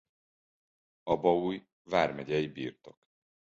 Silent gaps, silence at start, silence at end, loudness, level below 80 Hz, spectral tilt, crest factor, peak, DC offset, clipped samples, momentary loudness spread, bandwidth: 1.72-1.85 s; 1.05 s; 0.7 s; -31 LUFS; -64 dBFS; -6.5 dB/octave; 24 dB; -10 dBFS; under 0.1%; under 0.1%; 14 LU; 7.8 kHz